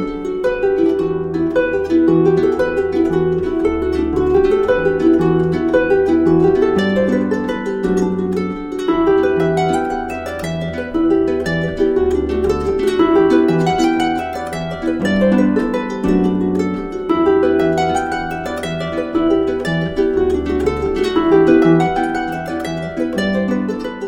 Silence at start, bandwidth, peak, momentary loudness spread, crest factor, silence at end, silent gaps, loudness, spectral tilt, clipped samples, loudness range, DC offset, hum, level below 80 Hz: 0 s; 11.5 kHz; 0 dBFS; 9 LU; 14 dB; 0 s; none; -16 LUFS; -7 dB/octave; under 0.1%; 3 LU; under 0.1%; none; -36 dBFS